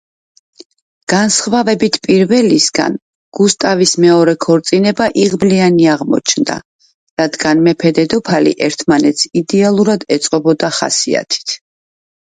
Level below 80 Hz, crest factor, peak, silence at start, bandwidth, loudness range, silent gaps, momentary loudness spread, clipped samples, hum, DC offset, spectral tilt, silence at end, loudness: -52 dBFS; 12 dB; 0 dBFS; 1.1 s; 9.6 kHz; 2 LU; 3.02-3.32 s, 6.65-6.79 s, 6.94-7.17 s; 8 LU; under 0.1%; none; under 0.1%; -4 dB/octave; 0.7 s; -12 LUFS